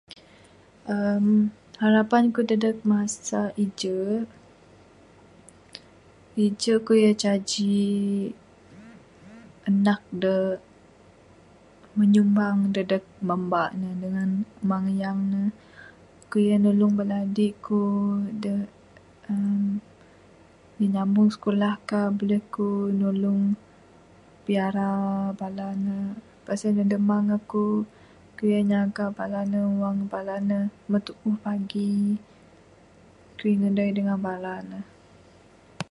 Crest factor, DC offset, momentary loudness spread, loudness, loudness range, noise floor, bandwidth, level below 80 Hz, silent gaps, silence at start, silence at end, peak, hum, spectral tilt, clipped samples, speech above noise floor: 18 dB; under 0.1%; 11 LU; -25 LUFS; 5 LU; -54 dBFS; 11 kHz; -64 dBFS; none; 0.1 s; 0.1 s; -6 dBFS; none; -6.5 dB/octave; under 0.1%; 30 dB